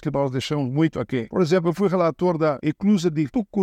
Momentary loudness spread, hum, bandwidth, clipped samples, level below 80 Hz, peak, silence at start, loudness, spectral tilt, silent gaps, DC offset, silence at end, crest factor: 4 LU; none; 12.5 kHz; under 0.1%; -56 dBFS; -8 dBFS; 0 s; -22 LUFS; -7 dB/octave; none; under 0.1%; 0 s; 14 dB